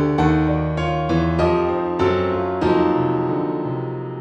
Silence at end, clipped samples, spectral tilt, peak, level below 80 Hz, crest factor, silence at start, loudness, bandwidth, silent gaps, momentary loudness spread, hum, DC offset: 0 s; under 0.1%; -8.5 dB/octave; -4 dBFS; -36 dBFS; 14 dB; 0 s; -20 LUFS; 8.2 kHz; none; 6 LU; none; under 0.1%